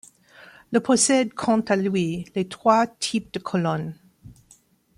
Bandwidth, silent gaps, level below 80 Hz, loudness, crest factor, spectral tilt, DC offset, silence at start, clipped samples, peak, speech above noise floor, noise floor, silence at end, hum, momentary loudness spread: 12.5 kHz; none; -62 dBFS; -22 LUFS; 20 dB; -4.5 dB/octave; under 0.1%; 0.7 s; under 0.1%; -4 dBFS; 35 dB; -58 dBFS; 0.65 s; none; 10 LU